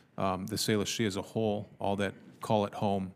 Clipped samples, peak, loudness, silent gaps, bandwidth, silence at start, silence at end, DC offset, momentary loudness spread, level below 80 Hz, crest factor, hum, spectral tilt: under 0.1%; -14 dBFS; -32 LUFS; none; 15.5 kHz; 0.2 s; 0 s; under 0.1%; 5 LU; -70 dBFS; 18 dB; none; -5 dB/octave